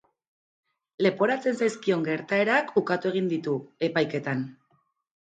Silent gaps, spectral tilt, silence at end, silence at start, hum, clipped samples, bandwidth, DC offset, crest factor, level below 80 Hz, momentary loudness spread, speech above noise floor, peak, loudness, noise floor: none; -6 dB/octave; 0.8 s; 1 s; none; under 0.1%; 9.2 kHz; under 0.1%; 18 dB; -74 dBFS; 7 LU; 44 dB; -8 dBFS; -26 LUFS; -70 dBFS